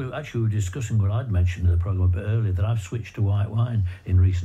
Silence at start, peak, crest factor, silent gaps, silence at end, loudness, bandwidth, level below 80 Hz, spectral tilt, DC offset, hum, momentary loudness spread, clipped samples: 0 s; -10 dBFS; 12 dB; none; 0 s; -24 LUFS; 8.4 kHz; -42 dBFS; -7.5 dB/octave; under 0.1%; none; 5 LU; under 0.1%